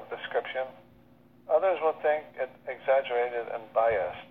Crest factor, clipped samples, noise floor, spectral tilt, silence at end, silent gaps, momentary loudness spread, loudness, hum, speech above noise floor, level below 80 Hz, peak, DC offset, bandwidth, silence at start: 18 dB; under 0.1%; -58 dBFS; -6.5 dB/octave; 0.05 s; none; 10 LU; -29 LUFS; 60 Hz at -60 dBFS; 29 dB; -66 dBFS; -12 dBFS; under 0.1%; 4.4 kHz; 0 s